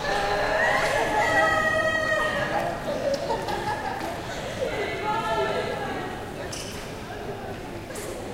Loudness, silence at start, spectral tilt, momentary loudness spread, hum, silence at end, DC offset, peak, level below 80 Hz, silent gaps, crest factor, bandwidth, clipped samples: -26 LUFS; 0 s; -4 dB/octave; 13 LU; none; 0 s; under 0.1%; -8 dBFS; -44 dBFS; none; 18 dB; 16.5 kHz; under 0.1%